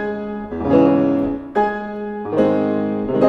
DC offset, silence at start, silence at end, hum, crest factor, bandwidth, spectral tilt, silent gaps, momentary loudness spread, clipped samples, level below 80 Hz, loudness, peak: under 0.1%; 0 s; 0 s; none; 18 dB; 6 kHz; -9 dB/octave; none; 12 LU; under 0.1%; -46 dBFS; -19 LUFS; 0 dBFS